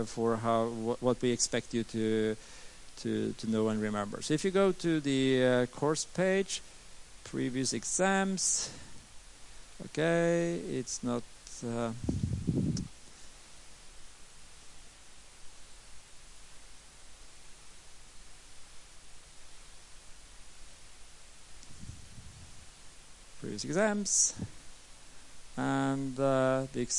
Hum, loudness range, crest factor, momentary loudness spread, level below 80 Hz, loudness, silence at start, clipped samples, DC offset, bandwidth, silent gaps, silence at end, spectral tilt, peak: none; 23 LU; 20 dB; 25 LU; -56 dBFS; -31 LUFS; 0 s; under 0.1%; under 0.1%; 11.5 kHz; none; 0 s; -4 dB/octave; -14 dBFS